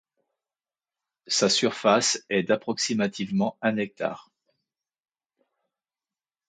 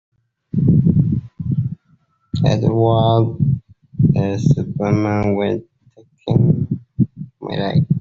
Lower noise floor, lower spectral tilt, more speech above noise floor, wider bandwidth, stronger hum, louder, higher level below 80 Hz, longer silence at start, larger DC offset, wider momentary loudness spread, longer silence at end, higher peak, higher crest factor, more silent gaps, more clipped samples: first, under -90 dBFS vs -58 dBFS; second, -3 dB/octave vs -8.5 dB/octave; first, over 65 dB vs 42 dB; first, 9.4 kHz vs 7.2 kHz; neither; second, -25 LUFS vs -18 LUFS; second, -72 dBFS vs -42 dBFS; first, 1.3 s vs 0.55 s; neither; second, 9 LU vs 12 LU; first, 2.3 s vs 0 s; second, -6 dBFS vs -2 dBFS; first, 22 dB vs 14 dB; neither; neither